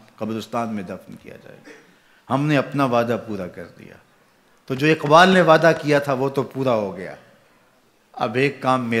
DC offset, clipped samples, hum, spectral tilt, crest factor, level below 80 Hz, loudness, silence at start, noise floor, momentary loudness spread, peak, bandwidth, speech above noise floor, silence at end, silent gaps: under 0.1%; under 0.1%; none; -6 dB/octave; 20 dB; -64 dBFS; -19 LUFS; 0.2 s; -58 dBFS; 22 LU; -2 dBFS; 15.5 kHz; 38 dB; 0 s; none